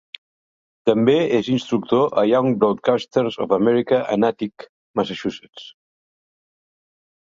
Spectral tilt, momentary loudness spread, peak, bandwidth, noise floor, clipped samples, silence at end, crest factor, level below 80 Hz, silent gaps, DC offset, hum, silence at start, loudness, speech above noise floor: -7 dB/octave; 12 LU; -2 dBFS; 7.6 kHz; under -90 dBFS; under 0.1%; 1.6 s; 18 dB; -62 dBFS; 4.69-4.94 s, 5.49-5.53 s; under 0.1%; none; 0.85 s; -20 LUFS; over 71 dB